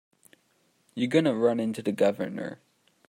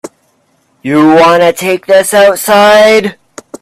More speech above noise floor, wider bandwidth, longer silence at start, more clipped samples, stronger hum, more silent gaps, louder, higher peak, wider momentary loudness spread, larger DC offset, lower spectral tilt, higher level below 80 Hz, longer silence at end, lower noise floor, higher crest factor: second, 43 dB vs 48 dB; about the same, 16 kHz vs 16 kHz; first, 0.95 s vs 0.05 s; second, under 0.1% vs 0.3%; neither; neither; second, -27 LUFS vs -6 LUFS; second, -8 dBFS vs 0 dBFS; first, 14 LU vs 9 LU; neither; first, -6.5 dB/octave vs -4 dB/octave; second, -76 dBFS vs -48 dBFS; first, 0.55 s vs 0.05 s; first, -69 dBFS vs -54 dBFS; first, 20 dB vs 8 dB